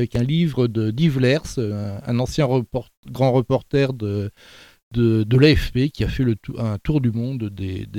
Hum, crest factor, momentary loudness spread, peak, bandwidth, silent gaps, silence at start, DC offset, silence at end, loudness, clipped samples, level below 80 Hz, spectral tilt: none; 18 dB; 11 LU; -2 dBFS; 15.5 kHz; 2.97-3.03 s, 4.83-4.91 s; 0 s; under 0.1%; 0 s; -21 LUFS; under 0.1%; -36 dBFS; -7.5 dB/octave